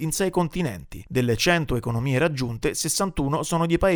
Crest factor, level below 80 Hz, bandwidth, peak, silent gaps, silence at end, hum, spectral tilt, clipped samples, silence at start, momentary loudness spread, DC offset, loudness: 18 dB; -40 dBFS; over 20 kHz; -4 dBFS; none; 0 s; none; -4.5 dB/octave; under 0.1%; 0 s; 7 LU; under 0.1%; -24 LUFS